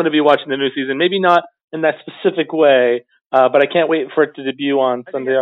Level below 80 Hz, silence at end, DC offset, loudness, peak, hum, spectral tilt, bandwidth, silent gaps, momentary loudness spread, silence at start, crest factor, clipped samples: -72 dBFS; 0 s; under 0.1%; -16 LUFS; 0 dBFS; none; -7 dB/octave; 6.6 kHz; 1.64-1.68 s, 3.26-3.30 s; 7 LU; 0 s; 16 dB; under 0.1%